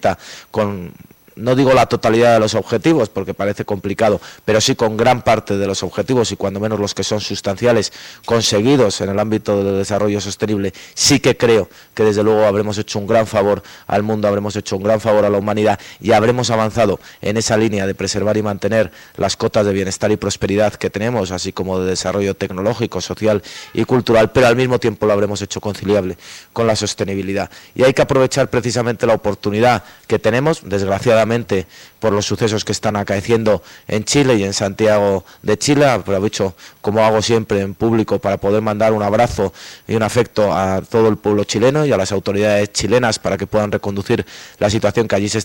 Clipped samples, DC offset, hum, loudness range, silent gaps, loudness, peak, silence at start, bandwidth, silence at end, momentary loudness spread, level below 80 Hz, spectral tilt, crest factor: under 0.1%; under 0.1%; none; 2 LU; none; -16 LUFS; -4 dBFS; 0 s; 16.5 kHz; 0 s; 8 LU; -44 dBFS; -5 dB/octave; 12 dB